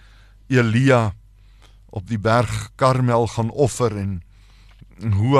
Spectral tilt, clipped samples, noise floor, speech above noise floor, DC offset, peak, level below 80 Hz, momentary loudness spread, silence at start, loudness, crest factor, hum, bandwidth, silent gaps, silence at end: -6.5 dB/octave; under 0.1%; -48 dBFS; 30 dB; under 0.1%; -2 dBFS; -44 dBFS; 13 LU; 0.5 s; -20 LUFS; 18 dB; none; 13 kHz; none; 0 s